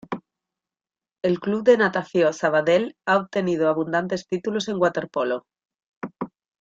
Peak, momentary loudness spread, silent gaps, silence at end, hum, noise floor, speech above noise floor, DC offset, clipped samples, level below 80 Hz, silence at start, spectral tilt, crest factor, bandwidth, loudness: -4 dBFS; 16 LU; 5.86-6.01 s; 0.35 s; none; under -90 dBFS; over 68 dB; under 0.1%; under 0.1%; -66 dBFS; 0.1 s; -5.5 dB/octave; 20 dB; 7.8 kHz; -22 LUFS